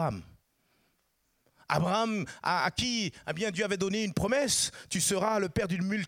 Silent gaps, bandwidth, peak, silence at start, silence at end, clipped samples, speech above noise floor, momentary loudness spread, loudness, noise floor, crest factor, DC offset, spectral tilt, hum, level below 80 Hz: none; 16.5 kHz; -12 dBFS; 0 s; 0 s; under 0.1%; 45 dB; 6 LU; -30 LUFS; -75 dBFS; 20 dB; under 0.1%; -3.5 dB/octave; none; -56 dBFS